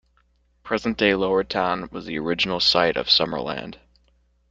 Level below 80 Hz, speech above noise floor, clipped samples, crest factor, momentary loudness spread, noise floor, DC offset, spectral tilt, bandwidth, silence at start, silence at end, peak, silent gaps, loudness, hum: -52 dBFS; 41 dB; under 0.1%; 20 dB; 12 LU; -63 dBFS; under 0.1%; -4.5 dB/octave; 9 kHz; 0.65 s; 0.75 s; -4 dBFS; none; -21 LUFS; none